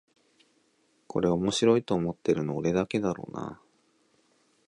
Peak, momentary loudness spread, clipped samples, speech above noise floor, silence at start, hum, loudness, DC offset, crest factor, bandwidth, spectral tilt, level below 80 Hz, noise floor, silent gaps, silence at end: -10 dBFS; 13 LU; under 0.1%; 42 dB; 1.15 s; none; -28 LUFS; under 0.1%; 20 dB; 11 kHz; -6 dB/octave; -58 dBFS; -69 dBFS; none; 1.15 s